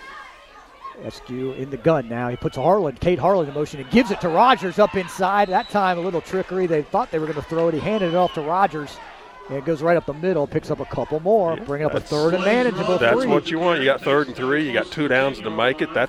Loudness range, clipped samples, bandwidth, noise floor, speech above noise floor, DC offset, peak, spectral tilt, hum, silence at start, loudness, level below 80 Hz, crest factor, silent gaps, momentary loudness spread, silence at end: 3 LU; under 0.1%; 15 kHz; -45 dBFS; 25 dB; under 0.1%; -4 dBFS; -6 dB/octave; none; 0 s; -21 LUFS; -48 dBFS; 18 dB; none; 11 LU; 0 s